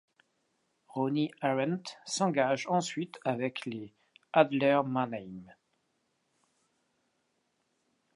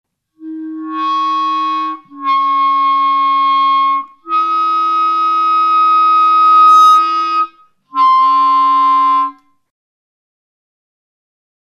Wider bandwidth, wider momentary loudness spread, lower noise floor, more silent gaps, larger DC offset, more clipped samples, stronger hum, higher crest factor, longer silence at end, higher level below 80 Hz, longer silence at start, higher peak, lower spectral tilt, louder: about the same, 11.5 kHz vs 12 kHz; about the same, 15 LU vs 14 LU; first, -77 dBFS vs -39 dBFS; neither; neither; neither; neither; first, 26 dB vs 12 dB; first, 2.7 s vs 2.4 s; about the same, -80 dBFS vs -80 dBFS; first, 0.95 s vs 0.4 s; second, -8 dBFS vs -2 dBFS; first, -5 dB/octave vs -0.5 dB/octave; second, -31 LUFS vs -11 LUFS